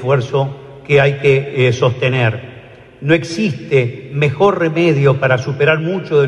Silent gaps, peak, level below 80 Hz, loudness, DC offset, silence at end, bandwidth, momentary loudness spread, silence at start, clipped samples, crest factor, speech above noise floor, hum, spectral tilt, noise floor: none; 0 dBFS; -52 dBFS; -15 LUFS; under 0.1%; 0 s; 10 kHz; 8 LU; 0 s; under 0.1%; 14 dB; 24 dB; none; -7 dB/octave; -38 dBFS